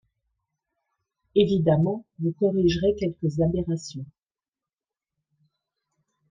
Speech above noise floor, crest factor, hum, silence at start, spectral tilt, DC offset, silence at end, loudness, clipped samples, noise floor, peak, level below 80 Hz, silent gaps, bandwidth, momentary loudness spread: over 67 dB; 20 dB; none; 1.35 s; -7.5 dB/octave; under 0.1%; 2.25 s; -24 LUFS; under 0.1%; under -90 dBFS; -6 dBFS; -50 dBFS; none; 7.6 kHz; 10 LU